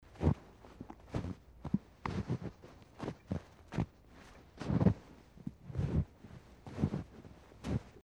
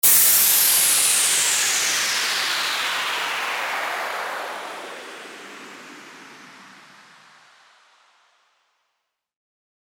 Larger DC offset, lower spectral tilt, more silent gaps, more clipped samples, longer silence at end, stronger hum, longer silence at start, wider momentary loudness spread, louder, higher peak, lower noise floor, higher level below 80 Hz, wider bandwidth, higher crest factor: neither; first, -8.5 dB/octave vs 2 dB/octave; neither; neither; second, 0.05 s vs 3.3 s; neither; about the same, 0.15 s vs 0.05 s; about the same, 22 LU vs 24 LU; second, -39 LUFS vs -18 LUFS; second, -16 dBFS vs -2 dBFS; second, -58 dBFS vs -77 dBFS; first, -50 dBFS vs -76 dBFS; second, 10.5 kHz vs over 20 kHz; about the same, 22 dB vs 20 dB